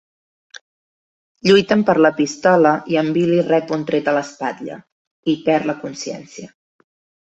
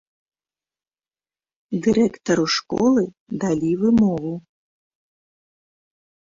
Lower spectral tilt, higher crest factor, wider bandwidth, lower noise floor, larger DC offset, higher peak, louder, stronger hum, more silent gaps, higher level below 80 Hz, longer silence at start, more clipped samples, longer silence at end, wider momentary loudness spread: about the same, -5.5 dB/octave vs -5.5 dB/octave; about the same, 18 dB vs 16 dB; about the same, 8.2 kHz vs 7.6 kHz; about the same, under -90 dBFS vs under -90 dBFS; neither; first, -2 dBFS vs -6 dBFS; first, -17 LUFS vs -20 LUFS; neither; first, 4.92-5.23 s vs 3.20-3.26 s; second, -62 dBFS vs -56 dBFS; second, 1.45 s vs 1.7 s; neither; second, 0.9 s vs 1.9 s; first, 18 LU vs 10 LU